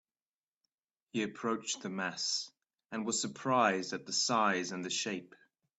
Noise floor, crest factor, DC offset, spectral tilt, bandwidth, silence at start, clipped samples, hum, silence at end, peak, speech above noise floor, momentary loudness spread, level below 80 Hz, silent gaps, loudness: under -90 dBFS; 22 dB; under 0.1%; -2.5 dB/octave; 8.2 kHz; 1.15 s; under 0.1%; none; 0.55 s; -14 dBFS; over 56 dB; 10 LU; -80 dBFS; none; -34 LUFS